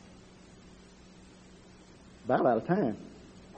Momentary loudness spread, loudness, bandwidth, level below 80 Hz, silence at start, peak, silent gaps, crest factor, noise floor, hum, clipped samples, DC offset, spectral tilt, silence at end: 27 LU; -29 LUFS; 8.4 kHz; -62 dBFS; 2.25 s; -12 dBFS; none; 22 dB; -54 dBFS; none; under 0.1%; under 0.1%; -8 dB/octave; 0.05 s